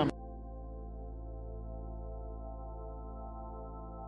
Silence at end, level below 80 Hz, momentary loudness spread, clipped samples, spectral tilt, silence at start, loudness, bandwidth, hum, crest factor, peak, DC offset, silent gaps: 0 s; -44 dBFS; 2 LU; under 0.1%; -6.5 dB/octave; 0 s; -45 LUFS; 3.8 kHz; none; 24 dB; -16 dBFS; under 0.1%; none